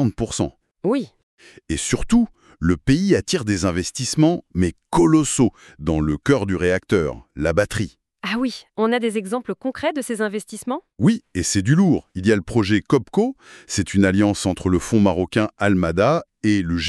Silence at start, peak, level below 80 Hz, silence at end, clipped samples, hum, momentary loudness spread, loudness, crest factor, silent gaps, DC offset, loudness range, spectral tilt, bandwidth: 0 s; -4 dBFS; -40 dBFS; 0 s; under 0.1%; none; 9 LU; -20 LUFS; 16 dB; 1.23-1.38 s; under 0.1%; 4 LU; -5.5 dB/octave; 13 kHz